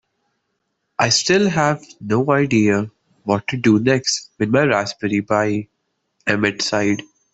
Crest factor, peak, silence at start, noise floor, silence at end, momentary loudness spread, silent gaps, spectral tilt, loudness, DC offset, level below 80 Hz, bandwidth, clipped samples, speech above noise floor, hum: 16 dB; -2 dBFS; 1 s; -73 dBFS; 0.3 s; 11 LU; none; -4.5 dB/octave; -18 LUFS; under 0.1%; -56 dBFS; 8.4 kHz; under 0.1%; 55 dB; none